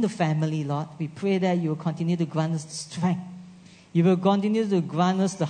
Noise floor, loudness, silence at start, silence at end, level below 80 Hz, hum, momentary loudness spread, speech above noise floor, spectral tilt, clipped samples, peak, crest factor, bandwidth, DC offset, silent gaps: -48 dBFS; -25 LUFS; 0 s; 0 s; -72 dBFS; none; 9 LU; 24 dB; -7 dB/octave; under 0.1%; -8 dBFS; 18 dB; 9.6 kHz; under 0.1%; none